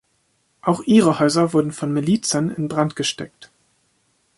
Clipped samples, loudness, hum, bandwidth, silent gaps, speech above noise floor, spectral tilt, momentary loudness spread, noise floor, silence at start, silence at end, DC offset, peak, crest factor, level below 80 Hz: under 0.1%; -19 LUFS; none; 11.5 kHz; none; 47 dB; -5 dB/octave; 9 LU; -66 dBFS; 0.65 s; 0.95 s; under 0.1%; -2 dBFS; 18 dB; -60 dBFS